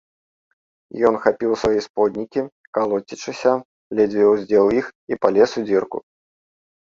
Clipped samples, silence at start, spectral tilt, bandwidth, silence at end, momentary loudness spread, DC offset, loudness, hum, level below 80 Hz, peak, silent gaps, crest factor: under 0.1%; 0.95 s; -5.5 dB/octave; 7.6 kHz; 0.95 s; 11 LU; under 0.1%; -20 LUFS; none; -54 dBFS; 0 dBFS; 1.90-1.94 s, 2.52-2.73 s, 3.65-3.90 s, 4.95-5.07 s; 20 dB